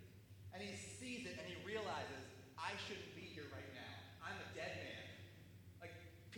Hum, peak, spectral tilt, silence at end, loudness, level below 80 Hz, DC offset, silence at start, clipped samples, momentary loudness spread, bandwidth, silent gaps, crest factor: none; -30 dBFS; -4 dB/octave; 0 s; -51 LUFS; -76 dBFS; under 0.1%; 0 s; under 0.1%; 12 LU; over 20 kHz; none; 22 dB